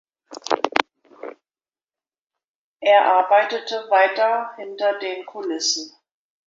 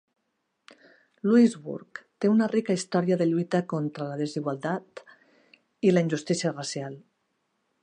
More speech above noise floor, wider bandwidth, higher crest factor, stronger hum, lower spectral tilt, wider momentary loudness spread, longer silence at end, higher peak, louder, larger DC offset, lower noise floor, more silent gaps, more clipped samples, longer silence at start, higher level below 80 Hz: first, over 71 dB vs 52 dB; second, 7.8 kHz vs 10 kHz; about the same, 22 dB vs 18 dB; neither; second, 0 dB/octave vs -6 dB/octave; first, 23 LU vs 16 LU; second, 0.6 s vs 0.85 s; first, 0 dBFS vs -10 dBFS; first, -20 LUFS vs -26 LUFS; neither; first, under -90 dBFS vs -78 dBFS; first, 2.48-2.76 s vs none; neither; second, 0.3 s vs 1.25 s; about the same, -78 dBFS vs -76 dBFS